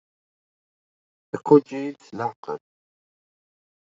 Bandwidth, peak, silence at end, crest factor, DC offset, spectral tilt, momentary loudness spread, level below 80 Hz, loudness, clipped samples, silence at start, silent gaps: 7.6 kHz; -2 dBFS; 1.35 s; 24 dB; under 0.1%; -8.5 dB/octave; 17 LU; -74 dBFS; -22 LUFS; under 0.1%; 1.35 s; 2.36-2.43 s